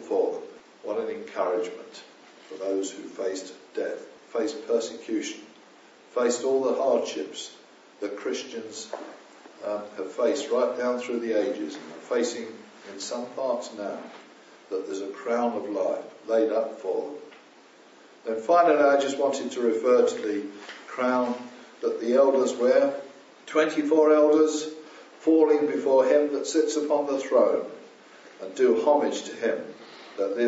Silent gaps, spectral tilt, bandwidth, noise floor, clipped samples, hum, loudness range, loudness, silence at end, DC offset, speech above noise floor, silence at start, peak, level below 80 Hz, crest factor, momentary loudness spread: none; -2.5 dB/octave; 8 kHz; -53 dBFS; under 0.1%; none; 9 LU; -26 LUFS; 0 s; under 0.1%; 28 dB; 0 s; -8 dBFS; -88 dBFS; 18 dB; 19 LU